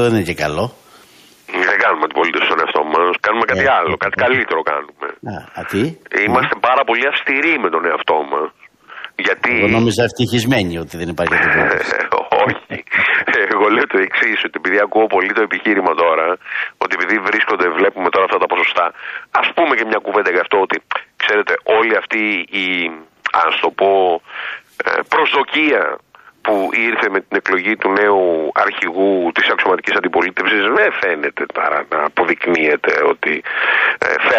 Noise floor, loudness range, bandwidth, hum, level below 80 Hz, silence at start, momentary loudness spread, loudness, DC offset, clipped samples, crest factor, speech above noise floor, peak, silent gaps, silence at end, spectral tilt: -46 dBFS; 2 LU; 14.5 kHz; none; -52 dBFS; 0 s; 8 LU; -15 LUFS; under 0.1%; under 0.1%; 14 dB; 30 dB; -2 dBFS; none; 0 s; -5 dB/octave